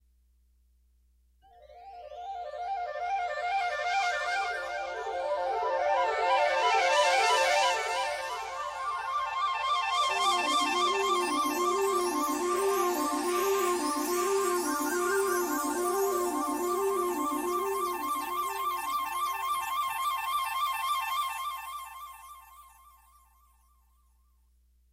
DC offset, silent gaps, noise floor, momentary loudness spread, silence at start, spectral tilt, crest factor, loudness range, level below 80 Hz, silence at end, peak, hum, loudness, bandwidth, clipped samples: under 0.1%; none; -66 dBFS; 10 LU; 1.6 s; -1 dB/octave; 16 dB; 9 LU; -64 dBFS; 2.25 s; -14 dBFS; none; -29 LUFS; 16 kHz; under 0.1%